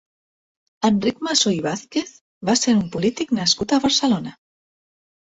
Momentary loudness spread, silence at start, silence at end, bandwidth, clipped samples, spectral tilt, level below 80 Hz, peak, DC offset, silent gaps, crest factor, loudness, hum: 9 LU; 0.8 s; 0.9 s; 8.2 kHz; under 0.1%; -3.5 dB/octave; -56 dBFS; -4 dBFS; under 0.1%; 2.21-2.41 s; 18 dB; -20 LUFS; none